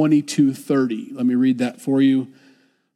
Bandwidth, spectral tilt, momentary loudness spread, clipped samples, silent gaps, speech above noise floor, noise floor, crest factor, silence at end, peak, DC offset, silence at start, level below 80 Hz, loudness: 13 kHz; -6.5 dB/octave; 6 LU; under 0.1%; none; 38 dB; -56 dBFS; 14 dB; 0.7 s; -6 dBFS; under 0.1%; 0 s; -76 dBFS; -19 LUFS